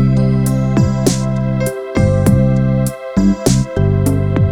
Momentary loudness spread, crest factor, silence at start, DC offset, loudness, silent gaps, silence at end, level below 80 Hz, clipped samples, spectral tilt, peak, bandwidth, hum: 5 LU; 12 dB; 0 s; under 0.1%; -14 LUFS; none; 0 s; -26 dBFS; under 0.1%; -7 dB/octave; 0 dBFS; 16.5 kHz; none